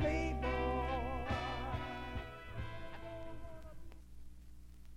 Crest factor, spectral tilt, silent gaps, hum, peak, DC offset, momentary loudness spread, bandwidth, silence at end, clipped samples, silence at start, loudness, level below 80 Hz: 16 dB; -6.5 dB/octave; none; 60 Hz at -60 dBFS; -24 dBFS; under 0.1%; 22 LU; 13 kHz; 0 s; under 0.1%; 0 s; -41 LUFS; -46 dBFS